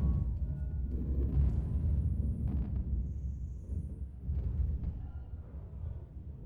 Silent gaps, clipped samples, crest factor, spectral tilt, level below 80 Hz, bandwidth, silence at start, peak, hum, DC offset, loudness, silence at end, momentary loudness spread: none; under 0.1%; 16 dB; -11.5 dB/octave; -36 dBFS; 1.8 kHz; 0 s; -18 dBFS; none; under 0.1%; -37 LUFS; 0 s; 12 LU